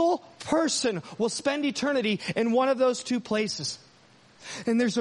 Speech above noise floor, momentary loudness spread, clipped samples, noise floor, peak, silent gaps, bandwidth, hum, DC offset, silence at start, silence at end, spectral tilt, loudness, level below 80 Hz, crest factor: 31 dB; 9 LU; under 0.1%; -57 dBFS; -10 dBFS; none; 11.5 kHz; none; under 0.1%; 0 s; 0 s; -4 dB/octave; -27 LUFS; -68 dBFS; 16 dB